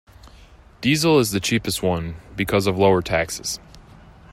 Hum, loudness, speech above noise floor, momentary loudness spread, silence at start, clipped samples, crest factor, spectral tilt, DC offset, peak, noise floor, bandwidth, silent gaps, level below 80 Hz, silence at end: none; -20 LUFS; 27 dB; 11 LU; 0.25 s; under 0.1%; 18 dB; -4.5 dB/octave; under 0.1%; -4 dBFS; -47 dBFS; 16 kHz; none; -46 dBFS; 0 s